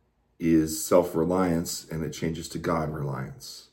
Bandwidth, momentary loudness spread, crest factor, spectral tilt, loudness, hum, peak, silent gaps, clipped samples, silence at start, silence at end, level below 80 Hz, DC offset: 17 kHz; 11 LU; 20 dB; -5.5 dB/octave; -27 LUFS; none; -8 dBFS; none; under 0.1%; 0.4 s; 0.1 s; -50 dBFS; under 0.1%